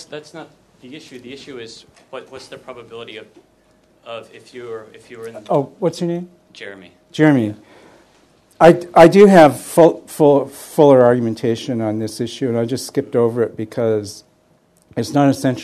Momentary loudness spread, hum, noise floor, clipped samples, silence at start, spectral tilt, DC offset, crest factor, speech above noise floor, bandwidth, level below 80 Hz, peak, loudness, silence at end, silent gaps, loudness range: 25 LU; none; -56 dBFS; 0.2%; 0.1 s; -6.5 dB/octave; under 0.1%; 16 dB; 40 dB; 13.5 kHz; -54 dBFS; 0 dBFS; -14 LUFS; 0 s; none; 23 LU